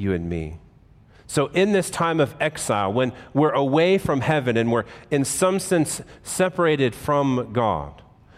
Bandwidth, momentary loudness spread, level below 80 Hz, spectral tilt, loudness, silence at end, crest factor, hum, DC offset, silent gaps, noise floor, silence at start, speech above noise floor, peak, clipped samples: 16 kHz; 8 LU; -50 dBFS; -5 dB/octave; -22 LUFS; 0.45 s; 14 dB; none; under 0.1%; none; -51 dBFS; 0 s; 30 dB; -8 dBFS; under 0.1%